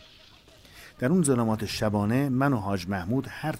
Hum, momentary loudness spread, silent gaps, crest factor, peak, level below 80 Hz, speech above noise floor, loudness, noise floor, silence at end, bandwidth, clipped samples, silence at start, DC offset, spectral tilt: none; 7 LU; none; 16 dB; -12 dBFS; -54 dBFS; 28 dB; -26 LUFS; -54 dBFS; 0 s; 16 kHz; under 0.1%; 0.75 s; under 0.1%; -6 dB/octave